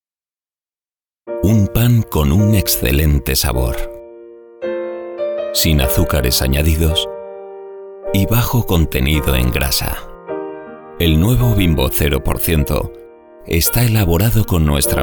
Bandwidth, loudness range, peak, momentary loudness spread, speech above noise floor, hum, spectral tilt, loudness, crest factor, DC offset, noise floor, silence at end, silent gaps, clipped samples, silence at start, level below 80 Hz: over 20 kHz; 2 LU; -2 dBFS; 15 LU; over 76 dB; none; -5 dB/octave; -15 LUFS; 14 dB; under 0.1%; under -90 dBFS; 0 s; none; under 0.1%; 1.25 s; -22 dBFS